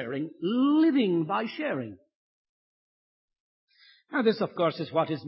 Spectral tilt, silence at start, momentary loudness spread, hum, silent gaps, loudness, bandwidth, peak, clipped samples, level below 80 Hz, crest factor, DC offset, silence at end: -10.5 dB/octave; 0 s; 11 LU; none; 2.15-3.28 s, 3.40-3.68 s; -27 LUFS; 5.8 kHz; -12 dBFS; under 0.1%; -76 dBFS; 18 dB; under 0.1%; 0 s